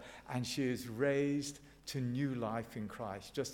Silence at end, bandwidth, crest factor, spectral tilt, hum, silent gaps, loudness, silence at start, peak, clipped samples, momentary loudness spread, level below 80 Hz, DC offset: 0 s; 17.5 kHz; 18 dB; -5.5 dB/octave; none; none; -38 LUFS; 0 s; -22 dBFS; under 0.1%; 10 LU; -66 dBFS; under 0.1%